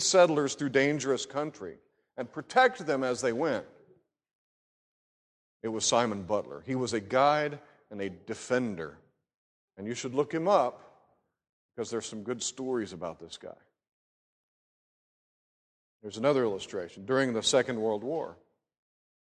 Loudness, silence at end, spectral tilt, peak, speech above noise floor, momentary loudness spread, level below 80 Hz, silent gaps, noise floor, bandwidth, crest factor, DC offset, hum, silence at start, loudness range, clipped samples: -30 LUFS; 0.9 s; -3.5 dB/octave; -10 dBFS; 40 dB; 18 LU; -70 dBFS; 4.35-5.60 s, 9.34-9.68 s, 11.49-11.69 s, 13.92-16.00 s; -69 dBFS; 11.5 kHz; 22 dB; under 0.1%; none; 0 s; 8 LU; under 0.1%